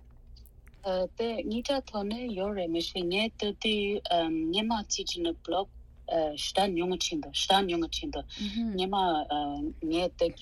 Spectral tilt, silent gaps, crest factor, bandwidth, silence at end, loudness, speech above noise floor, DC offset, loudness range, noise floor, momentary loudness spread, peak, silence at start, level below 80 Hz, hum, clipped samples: -3.5 dB/octave; none; 20 dB; 13 kHz; 0 s; -30 LUFS; 22 dB; under 0.1%; 2 LU; -52 dBFS; 7 LU; -12 dBFS; 0 s; -50 dBFS; none; under 0.1%